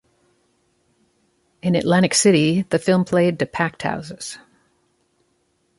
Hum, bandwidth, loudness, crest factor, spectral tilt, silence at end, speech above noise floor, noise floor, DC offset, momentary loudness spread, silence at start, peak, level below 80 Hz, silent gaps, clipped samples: none; 11.5 kHz; -19 LUFS; 18 dB; -5 dB/octave; 1.4 s; 48 dB; -66 dBFS; under 0.1%; 17 LU; 1.65 s; -4 dBFS; -58 dBFS; none; under 0.1%